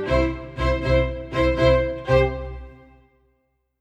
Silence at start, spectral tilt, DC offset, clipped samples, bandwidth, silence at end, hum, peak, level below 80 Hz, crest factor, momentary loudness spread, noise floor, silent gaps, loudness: 0 s; -7.5 dB/octave; under 0.1%; under 0.1%; 8.4 kHz; 1.05 s; none; -6 dBFS; -30 dBFS; 18 dB; 11 LU; -69 dBFS; none; -21 LUFS